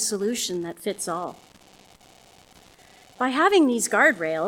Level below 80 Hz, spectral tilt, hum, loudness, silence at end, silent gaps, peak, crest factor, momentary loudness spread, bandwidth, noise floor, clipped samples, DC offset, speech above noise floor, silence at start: -66 dBFS; -2.5 dB/octave; none; -22 LUFS; 0 s; none; -6 dBFS; 20 dB; 12 LU; 18 kHz; -53 dBFS; under 0.1%; under 0.1%; 30 dB; 0 s